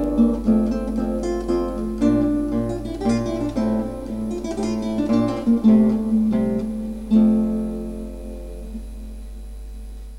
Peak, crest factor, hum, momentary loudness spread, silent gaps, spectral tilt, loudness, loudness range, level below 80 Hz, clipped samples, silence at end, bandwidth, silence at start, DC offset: -6 dBFS; 16 dB; none; 19 LU; none; -8 dB/octave; -21 LUFS; 4 LU; -34 dBFS; under 0.1%; 0 s; 11.5 kHz; 0 s; 0.4%